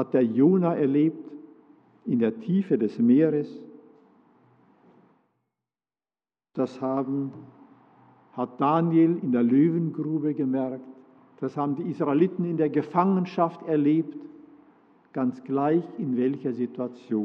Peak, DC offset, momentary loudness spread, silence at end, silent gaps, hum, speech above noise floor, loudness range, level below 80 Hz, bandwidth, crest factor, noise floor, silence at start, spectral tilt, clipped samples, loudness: -8 dBFS; under 0.1%; 14 LU; 0 s; none; none; over 66 dB; 9 LU; -86 dBFS; 6 kHz; 18 dB; under -90 dBFS; 0 s; -10.5 dB/octave; under 0.1%; -25 LUFS